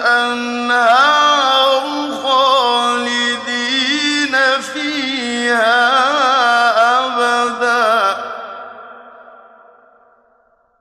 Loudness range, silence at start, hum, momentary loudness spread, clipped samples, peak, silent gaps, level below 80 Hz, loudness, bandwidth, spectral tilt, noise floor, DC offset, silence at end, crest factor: 5 LU; 0 s; none; 8 LU; under 0.1%; -2 dBFS; none; -70 dBFS; -13 LUFS; 13 kHz; -1 dB/octave; -56 dBFS; under 0.1%; 1.6 s; 14 dB